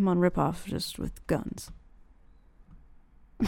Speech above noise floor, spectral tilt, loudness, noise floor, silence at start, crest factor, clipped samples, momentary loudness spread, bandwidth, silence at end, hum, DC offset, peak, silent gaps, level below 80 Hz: 27 dB; -6.5 dB/octave; -31 LUFS; -56 dBFS; 0 s; 20 dB; under 0.1%; 16 LU; 17.5 kHz; 0 s; none; under 0.1%; -10 dBFS; none; -48 dBFS